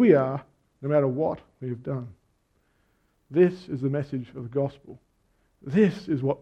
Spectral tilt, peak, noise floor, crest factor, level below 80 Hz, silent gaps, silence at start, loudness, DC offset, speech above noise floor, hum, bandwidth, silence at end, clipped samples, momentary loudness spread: -9.5 dB/octave; -6 dBFS; -69 dBFS; 20 dB; -64 dBFS; none; 0 s; -26 LUFS; under 0.1%; 44 dB; none; 8 kHz; 0.05 s; under 0.1%; 13 LU